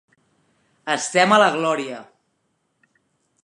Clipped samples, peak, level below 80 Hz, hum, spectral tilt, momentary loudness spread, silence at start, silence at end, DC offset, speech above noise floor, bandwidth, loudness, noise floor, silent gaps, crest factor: under 0.1%; -2 dBFS; -78 dBFS; none; -3 dB/octave; 20 LU; 0.85 s; 1.4 s; under 0.1%; 52 dB; 11.5 kHz; -18 LUFS; -71 dBFS; none; 22 dB